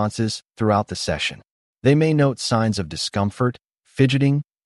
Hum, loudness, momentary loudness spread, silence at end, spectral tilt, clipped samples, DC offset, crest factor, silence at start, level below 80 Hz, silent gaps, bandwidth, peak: none; -21 LUFS; 8 LU; 0.25 s; -6 dB/octave; under 0.1%; under 0.1%; 16 dB; 0 s; -50 dBFS; 1.51-1.75 s; 11.5 kHz; -4 dBFS